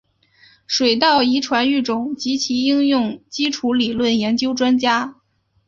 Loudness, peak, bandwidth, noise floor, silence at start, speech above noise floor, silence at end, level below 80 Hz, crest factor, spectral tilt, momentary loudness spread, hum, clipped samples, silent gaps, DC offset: -18 LUFS; -2 dBFS; 7.4 kHz; -53 dBFS; 0.7 s; 36 dB; 0.55 s; -58 dBFS; 18 dB; -3.5 dB/octave; 8 LU; none; under 0.1%; none; under 0.1%